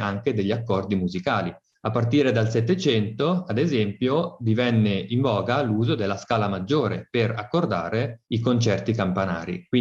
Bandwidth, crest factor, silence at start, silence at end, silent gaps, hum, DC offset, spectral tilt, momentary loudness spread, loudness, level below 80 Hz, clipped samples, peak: 7.6 kHz; 16 dB; 0 s; 0 s; none; none; under 0.1%; -7 dB/octave; 5 LU; -24 LUFS; -60 dBFS; under 0.1%; -8 dBFS